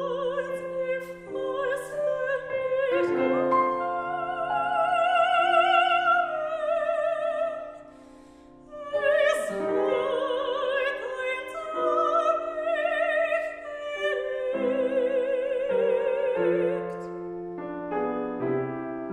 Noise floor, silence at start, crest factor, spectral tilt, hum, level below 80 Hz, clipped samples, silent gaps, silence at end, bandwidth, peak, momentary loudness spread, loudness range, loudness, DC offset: -50 dBFS; 0 s; 16 dB; -5 dB/octave; none; -62 dBFS; under 0.1%; none; 0 s; 13 kHz; -10 dBFS; 11 LU; 4 LU; -26 LUFS; under 0.1%